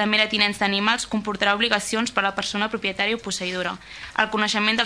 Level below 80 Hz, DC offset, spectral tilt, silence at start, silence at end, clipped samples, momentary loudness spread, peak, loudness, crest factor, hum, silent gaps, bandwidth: -54 dBFS; under 0.1%; -2.5 dB/octave; 0 s; 0 s; under 0.1%; 7 LU; -4 dBFS; -22 LUFS; 20 dB; none; none; 11 kHz